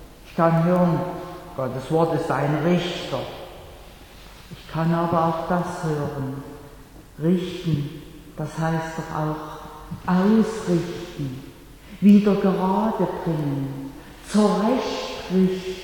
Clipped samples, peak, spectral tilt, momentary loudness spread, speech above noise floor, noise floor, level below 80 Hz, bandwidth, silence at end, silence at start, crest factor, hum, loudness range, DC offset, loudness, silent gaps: under 0.1%; -4 dBFS; -7.5 dB/octave; 19 LU; 23 dB; -44 dBFS; -48 dBFS; 18.5 kHz; 0 s; 0 s; 18 dB; none; 6 LU; under 0.1%; -23 LUFS; none